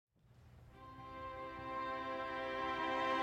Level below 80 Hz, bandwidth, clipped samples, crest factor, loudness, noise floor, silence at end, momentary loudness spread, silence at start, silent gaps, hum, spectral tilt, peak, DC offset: -66 dBFS; 13 kHz; under 0.1%; 16 dB; -42 LUFS; -64 dBFS; 0 s; 20 LU; 0.3 s; none; none; -5 dB/octave; -26 dBFS; under 0.1%